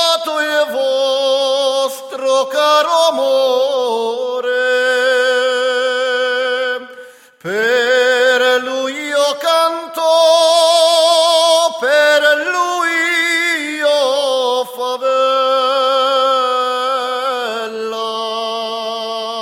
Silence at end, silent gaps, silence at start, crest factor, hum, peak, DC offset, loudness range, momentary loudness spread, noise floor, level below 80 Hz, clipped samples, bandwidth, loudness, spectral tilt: 0 s; none; 0 s; 14 dB; none; 0 dBFS; under 0.1%; 4 LU; 10 LU; -38 dBFS; -74 dBFS; under 0.1%; 16.5 kHz; -14 LUFS; -0.5 dB/octave